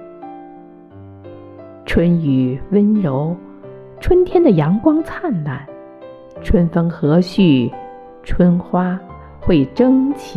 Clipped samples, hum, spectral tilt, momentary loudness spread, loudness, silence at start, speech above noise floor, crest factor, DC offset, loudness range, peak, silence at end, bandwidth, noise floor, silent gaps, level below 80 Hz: under 0.1%; none; -9 dB/octave; 23 LU; -16 LUFS; 0 s; 25 dB; 16 dB; under 0.1%; 3 LU; -2 dBFS; 0 s; 8 kHz; -39 dBFS; none; -32 dBFS